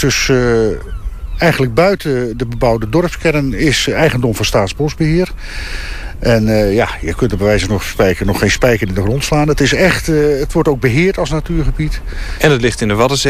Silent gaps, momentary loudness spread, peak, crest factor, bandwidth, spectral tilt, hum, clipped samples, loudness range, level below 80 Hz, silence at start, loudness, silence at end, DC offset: none; 9 LU; 0 dBFS; 14 dB; 15.5 kHz; -5 dB/octave; none; under 0.1%; 2 LU; -24 dBFS; 0 s; -14 LUFS; 0 s; 1%